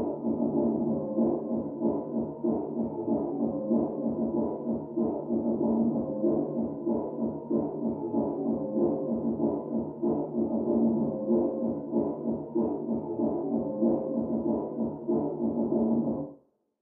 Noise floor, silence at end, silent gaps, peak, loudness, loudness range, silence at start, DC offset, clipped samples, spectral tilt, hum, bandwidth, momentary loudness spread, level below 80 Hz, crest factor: -57 dBFS; 0.45 s; none; -14 dBFS; -30 LUFS; 1 LU; 0 s; under 0.1%; under 0.1%; -14.5 dB/octave; none; 1.6 kHz; 5 LU; -60 dBFS; 14 dB